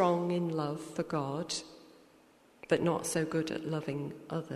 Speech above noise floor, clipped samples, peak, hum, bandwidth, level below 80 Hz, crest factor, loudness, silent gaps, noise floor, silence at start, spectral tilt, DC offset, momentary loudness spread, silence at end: 28 dB; under 0.1%; -16 dBFS; none; 13.5 kHz; -70 dBFS; 18 dB; -34 LUFS; none; -62 dBFS; 0 s; -5.5 dB/octave; under 0.1%; 9 LU; 0 s